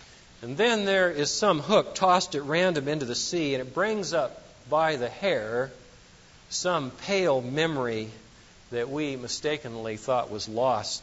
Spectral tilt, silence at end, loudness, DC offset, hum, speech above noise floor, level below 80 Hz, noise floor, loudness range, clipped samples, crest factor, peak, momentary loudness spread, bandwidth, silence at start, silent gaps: -3.5 dB/octave; 0 s; -27 LUFS; under 0.1%; none; 27 dB; -60 dBFS; -53 dBFS; 5 LU; under 0.1%; 20 dB; -8 dBFS; 11 LU; 8 kHz; 0 s; none